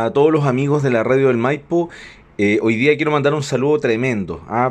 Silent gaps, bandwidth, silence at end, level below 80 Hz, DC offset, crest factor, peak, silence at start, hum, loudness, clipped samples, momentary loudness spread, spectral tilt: none; 9.6 kHz; 0 s; -52 dBFS; under 0.1%; 14 dB; -2 dBFS; 0 s; none; -17 LUFS; under 0.1%; 6 LU; -7 dB/octave